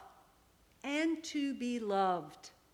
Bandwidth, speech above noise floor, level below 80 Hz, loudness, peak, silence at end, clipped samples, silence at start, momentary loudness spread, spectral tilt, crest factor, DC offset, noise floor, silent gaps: 16 kHz; 31 dB; -74 dBFS; -36 LUFS; -20 dBFS; 0.25 s; under 0.1%; 0 s; 15 LU; -4.5 dB/octave; 16 dB; under 0.1%; -67 dBFS; none